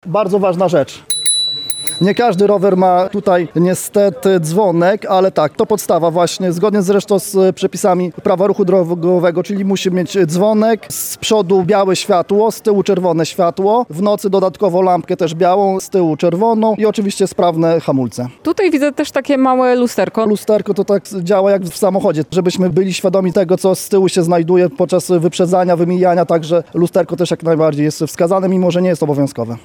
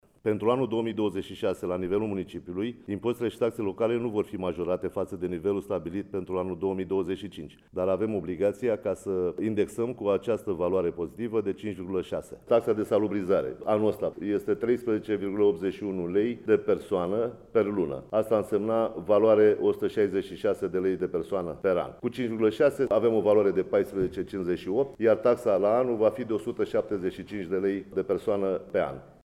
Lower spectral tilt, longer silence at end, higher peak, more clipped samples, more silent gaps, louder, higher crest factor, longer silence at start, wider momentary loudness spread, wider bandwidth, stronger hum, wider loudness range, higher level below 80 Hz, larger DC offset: second, -5.5 dB/octave vs -7.5 dB/octave; about the same, 0.05 s vs 0.15 s; first, 0 dBFS vs -10 dBFS; neither; neither; first, -14 LUFS vs -28 LUFS; about the same, 12 dB vs 16 dB; second, 0.05 s vs 0.25 s; second, 4 LU vs 8 LU; first, 17.5 kHz vs 14 kHz; neither; second, 1 LU vs 5 LU; about the same, -56 dBFS vs -60 dBFS; neither